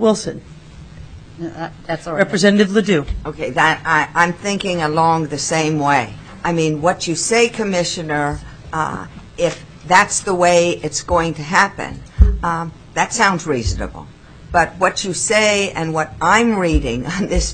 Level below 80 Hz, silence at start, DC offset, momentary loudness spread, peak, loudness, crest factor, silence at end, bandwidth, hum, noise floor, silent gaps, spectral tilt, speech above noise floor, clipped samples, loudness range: -28 dBFS; 0 s; 0.2%; 14 LU; 0 dBFS; -17 LUFS; 18 dB; 0 s; 11 kHz; none; -37 dBFS; none; -4 dB/octave; 20 dB; under 0.1%; 3 LU